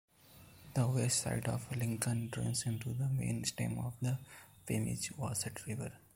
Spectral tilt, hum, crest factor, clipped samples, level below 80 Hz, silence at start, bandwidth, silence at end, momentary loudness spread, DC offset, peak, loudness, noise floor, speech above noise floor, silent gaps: -4.5 dB/octave; none; 24 dB; under 0.1%; -62 dBFS; 0.3 s; 16.5 kHz; 0.2 s; 10 LU; under 0.1%; -14 dBFS; -37 LUFS; -60 dBFS; 23 dB; none